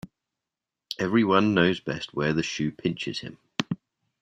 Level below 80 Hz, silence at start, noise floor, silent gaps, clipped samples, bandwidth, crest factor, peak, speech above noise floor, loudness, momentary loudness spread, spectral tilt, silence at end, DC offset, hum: -60 dBFS; 0.05 s; -88 dBFS; none; under 0.1%; 12 kHz; 22 dB; -4 dBFS; 63 dB; -26 LUFS; 13 LU; -5.5 dB/octave; 0.45 s; under 0.1%; none